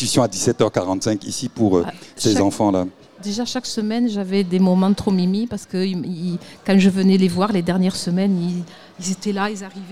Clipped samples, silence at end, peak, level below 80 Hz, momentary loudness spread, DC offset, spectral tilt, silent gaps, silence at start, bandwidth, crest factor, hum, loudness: under 0.1%; 0 s; -2 dBFS; -52 dBFS; 11 LU; 0.4%; -5.5 dB/octave; none; 0 s; 13.5 kHz; 18 dB; none; -20 LUFS